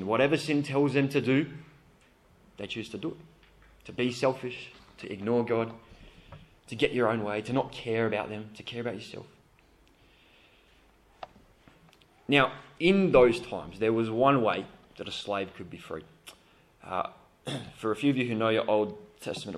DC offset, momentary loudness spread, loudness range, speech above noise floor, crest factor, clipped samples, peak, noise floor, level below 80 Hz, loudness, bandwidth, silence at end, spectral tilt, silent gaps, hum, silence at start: under 0.1%; 19 LU; 11 LU; 33 dB; 24 dB; under 0.1%; -6 dBFS; -61 dBFS; -60 dBFS; -29 LUFS; 13.5 kHz; 0 s; -6 dB/octave; none; none; 0 s